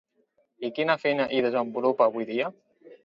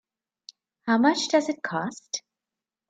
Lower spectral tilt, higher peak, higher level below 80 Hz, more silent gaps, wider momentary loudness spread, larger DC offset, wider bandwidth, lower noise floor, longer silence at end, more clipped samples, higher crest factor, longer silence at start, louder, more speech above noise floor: first, -7 dB/octave vs -3.5 dB/octave; about the same, -8 dBFS vs -8 dBFS; about the same, -74 dBFS vs -76 dBFS; neither; second, 10 LU vs 13 LU; neither; second, 7.2 kHz vs 9.2 kHz; second, -70 dBFS vs -89 dBFS; second, 0.1 s vs 0.7 s; neither; about the same, 20 dB vs 18 dB; second, 0.6 s vs 0.85 s; about the same, -26 LUFS vs -25 LUFS; second, 44 dB vs 65 dB